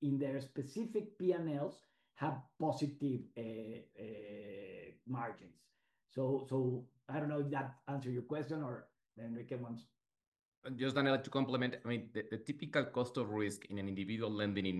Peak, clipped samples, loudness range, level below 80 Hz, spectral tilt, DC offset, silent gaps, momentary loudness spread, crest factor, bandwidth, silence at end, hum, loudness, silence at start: -20 dBFS; under 0.1%; 6 LU; -74 dBFS; -6.5 dB/octave; under 0.1%; 10.27-10.32 s, 10.45-10.62 s; 13 LU; 20 dB; 12 kHz; 0 s; none; -40 LUFS; 0 s